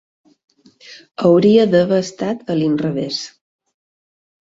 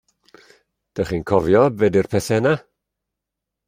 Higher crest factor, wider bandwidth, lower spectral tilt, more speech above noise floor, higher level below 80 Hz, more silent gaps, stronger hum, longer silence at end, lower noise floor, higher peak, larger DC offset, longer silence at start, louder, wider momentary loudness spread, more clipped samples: about the same, 16 dB vs 20 dB; second, 7.8 kHz vs 16 kHz; about the same, -6.5 dB/octave vs -6.5 dB/octave; second, 28 dB vs 65 dB; second, -60 dBFS vs -50 dBFS; neither; neither; about the same, 1.15 s vs 1.1 s; second, -43 dBFS vs -83 dBFS; about the same, -2 dBFS vs -2 dBFS; neither; about the same, 0.9 s vs 0.95 s; first, -16 LUFS vs -19 LUFS; first, 13 LU vs 10 LU; neither